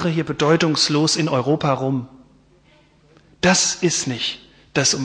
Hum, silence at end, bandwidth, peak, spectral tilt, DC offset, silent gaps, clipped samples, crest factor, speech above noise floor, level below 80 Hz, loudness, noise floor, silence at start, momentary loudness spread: none; 0 s; 10.5 kHz; -4 dBFS; -3.5 dB/octave; under 0.1%; none; under 0.1%; 16 dB; 35 dB; -54 dBFS; -19 LUFS; -54 dBFS; 0 s; 9 LU